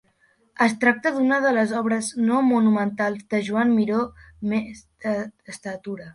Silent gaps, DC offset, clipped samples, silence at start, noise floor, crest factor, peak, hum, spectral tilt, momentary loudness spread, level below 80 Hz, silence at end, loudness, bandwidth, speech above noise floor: none; under 0.1%; under 0.1%; 0.6 s; -63 dBFS; 16 dB; -6 dBFS; none; -5.5 dB/octave; 14 LU; -60 dBFS; 0.05 s; -22 LUFS; 11.5 kHz; 41 dB